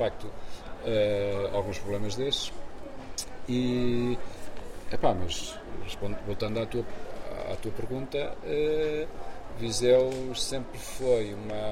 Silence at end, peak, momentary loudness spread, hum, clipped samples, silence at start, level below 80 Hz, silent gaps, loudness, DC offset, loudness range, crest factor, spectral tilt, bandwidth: 0 s; -10 dBFS; 16 LU; none; under 0.1%; 0 s; -44 dBFS; none; -31 LUFS; under 0.1%; 5 LU; 20 dB; -5 dB/octave; 16 kHz